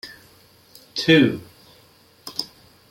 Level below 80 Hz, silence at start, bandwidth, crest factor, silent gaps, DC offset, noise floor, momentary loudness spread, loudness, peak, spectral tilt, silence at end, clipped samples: -62 dBFS; 0.05 s; 16.5 kHz; 22 dB; none; under 0.1%; -54 dBFS; 24 LU; -20 LUFS; -2 dBFS; -5.5 dB/octave; 0.45 s; under 0.1%